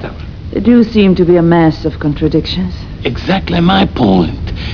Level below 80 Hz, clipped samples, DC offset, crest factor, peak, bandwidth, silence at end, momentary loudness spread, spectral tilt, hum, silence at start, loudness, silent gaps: -26 dBFS; 0.4%; 1%; 12 dB; 0 dBFS; 5.4 kHz; 0 s; 12 LU; -8.5 dB/octave; none; 0 s; -12 LUFS; none